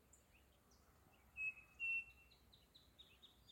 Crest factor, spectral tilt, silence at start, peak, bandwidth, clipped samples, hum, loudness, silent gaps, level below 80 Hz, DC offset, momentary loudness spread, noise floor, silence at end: 16 dB; -2 dB/octave; 0.15 s; -38 dBFS; 16.5 kHz; under 0.1%; none; -45 LUFS; none; -76 dBFS; under 0.1%; 25 LU; -73 dBFS; 0 s